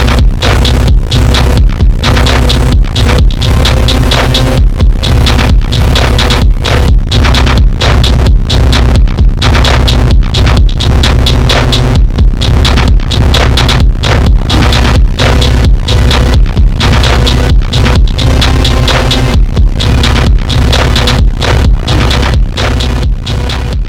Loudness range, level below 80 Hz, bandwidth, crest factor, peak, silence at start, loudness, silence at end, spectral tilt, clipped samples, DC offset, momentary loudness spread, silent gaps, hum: 1 LU; -8 dBFS; 15.5 kHz; 6 dB; 0 dBFS; 0 s; -8 LUFS; 0 s; -5 dB/octave; 0.2%; under 0.1%; 2 LU; none; none